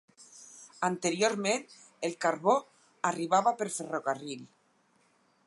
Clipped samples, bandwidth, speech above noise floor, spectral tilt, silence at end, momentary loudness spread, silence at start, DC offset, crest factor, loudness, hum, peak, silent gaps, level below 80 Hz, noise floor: under 0.1%; 11.5 kHz; 39 dB; -3.5 dB/octave; 1 s; 18 LU; 0.2 s; under 0.1%; 20 dB; -30 LUFS; none; -12 dBFS; none; -86 dBFS; -69 dBFS